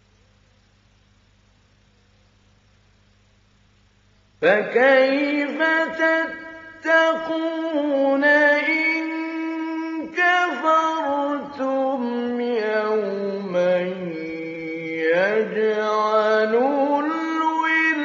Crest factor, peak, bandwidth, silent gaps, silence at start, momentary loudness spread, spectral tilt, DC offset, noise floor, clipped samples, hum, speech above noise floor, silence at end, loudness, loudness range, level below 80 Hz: 18 dB; -4 dBFS; 7.6 kHz; none; 4.4 s; 11 LU; -2 dB/octave; under 0.1%; -58 dBFS; under 0.1%; none; 38 dB; 0 s; -20 LUFS; 4 LU; -68 dBFS